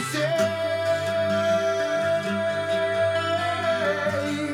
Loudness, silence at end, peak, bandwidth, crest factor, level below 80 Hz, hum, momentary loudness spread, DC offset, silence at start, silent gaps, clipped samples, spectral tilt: -24 LUFS; 0 s; -12 dBFS; 14.5 kHz; 12 dB; -68 dBFS; none; 3 LU; under 0.1%; 0 s; none; under 0.1%; -4.5 dB/octave